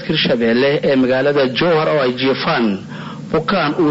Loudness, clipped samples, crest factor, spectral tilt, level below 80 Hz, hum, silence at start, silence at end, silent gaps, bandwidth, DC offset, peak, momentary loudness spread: -15 LUFS; under 0.1%; 10 dB; -7 dB/octave; -50 dBFS; none; 0 s; 0 s; none; 8 kHz; under 0.1%; -6 dBFS; 6 LU